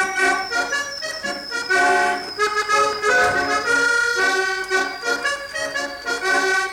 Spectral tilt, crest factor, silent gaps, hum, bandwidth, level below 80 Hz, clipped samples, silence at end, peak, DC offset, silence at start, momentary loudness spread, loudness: -1 dB/octave; 14 dB; none; none; 17.5 kHz; -54 dBFS; under 0.1%; 0 s; -6 dBFS; under 0.1%; 0 s; 8 LU; -19 LUFS